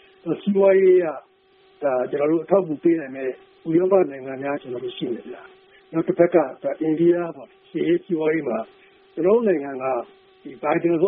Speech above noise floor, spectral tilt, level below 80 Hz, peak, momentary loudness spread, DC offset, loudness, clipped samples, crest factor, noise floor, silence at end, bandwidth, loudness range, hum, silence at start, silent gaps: 36 dB; -6.5 dB/octave; -68 dBFS; -2 dBFS; 15 LU; under 0.1%; -22 LUFS; under 0.1%; 18 dB; -56 dBFS; 0 s; 3.8 kHz; 3 LU; none; 0.25 s; none